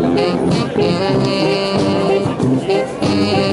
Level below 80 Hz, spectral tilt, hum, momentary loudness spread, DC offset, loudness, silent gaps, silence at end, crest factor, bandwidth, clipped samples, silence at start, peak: -44 dBFS; -6.5 dB/octave; none; 2 LU; under 0.1%; -16 LUFS; none; 0 s; 12 dB; 11.5 kHz; under 0.1%; 0 s; -4 dBFS